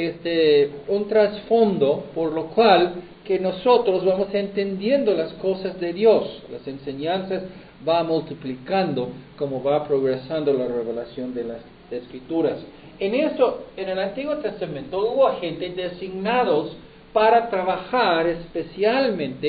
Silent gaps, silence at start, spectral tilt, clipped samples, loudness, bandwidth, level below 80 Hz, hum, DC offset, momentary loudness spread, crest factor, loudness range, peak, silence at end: none; 0 s; -10.5 dB/octave; under 0.1%; -22 LUFS; 4.9 kHz; -56 dBFS; none; under 0.1%; 13 LU; 18 dB; 6 LU; -4 dBFS; 0 s